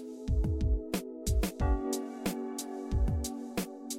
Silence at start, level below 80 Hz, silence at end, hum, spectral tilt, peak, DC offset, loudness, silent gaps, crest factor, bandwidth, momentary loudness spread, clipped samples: 0 s; -34 dBFS; 0 s; none; -5.5 dB/octave; -18 dBFS; under 0.1%; -34 LUFS; none; 14 dB; 16.5 kHz; 6 LU; under 0.1%